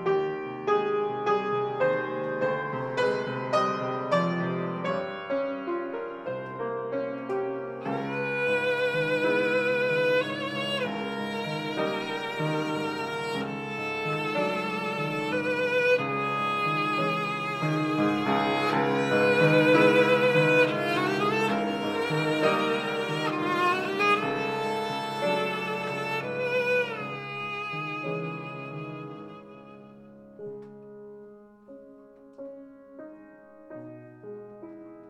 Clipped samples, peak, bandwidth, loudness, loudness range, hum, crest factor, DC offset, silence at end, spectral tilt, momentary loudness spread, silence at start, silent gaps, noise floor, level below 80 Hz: under 0.1%; -8 dBFS; 14.5 kHz; -27 LUFS; 21 LU; none; 20 dB; under 0.1%; 0 s; -6 dB/octave; 20 LU; 0 s; none; -51 dBFS; -70 dBFS